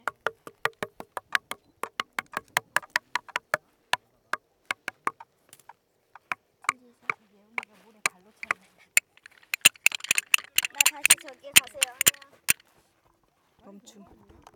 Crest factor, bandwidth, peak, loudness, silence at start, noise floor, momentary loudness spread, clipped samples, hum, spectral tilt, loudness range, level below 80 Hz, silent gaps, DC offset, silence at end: 30 dB; over 20 kHz; 0 dBFS; -26 LUFS; 0.05 s; -68 dBFS; 16 LU; under 0.1%; none; 1.5 dB/octave; 13 LU; -70 dBFS; none; under 0.1%; 2 s